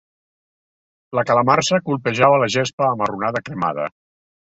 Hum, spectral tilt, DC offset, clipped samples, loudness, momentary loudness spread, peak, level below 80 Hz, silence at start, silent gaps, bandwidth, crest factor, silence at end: none; -4.5 dB/octave; under 0.1%; under 0.1%; -18 LUFS; 9 LU; -2 dBFS; -58 dBFS; 1.1 s; 2.73-2.78 s; 8.2 kHz; 20 dB; 0.6 s